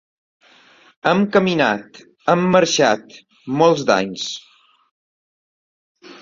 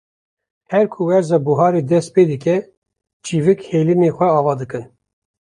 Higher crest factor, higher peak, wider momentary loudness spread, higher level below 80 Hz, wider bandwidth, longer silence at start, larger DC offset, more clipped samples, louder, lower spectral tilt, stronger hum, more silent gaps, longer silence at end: about the same, 18 dB vs 16 dB; about the same, -2 dBFS vs -2 dBFS; first, 12 LU vs 9 LU; about the same, -60 dBFS vs -58 dBFS; second, 7.6 kHz vs 11 kHz; first, 1.05 s vs 0.7 s; neither; neither; about the same, -17 LUFS vs -16 LUFS; second, -4.5 dB/octave vs -7.5 dB/octave; neither; first, 4.91-5.95 s vs 2.77-2.82 s, 3.13-3.20 s; second, 0.05 s vs 0.75 s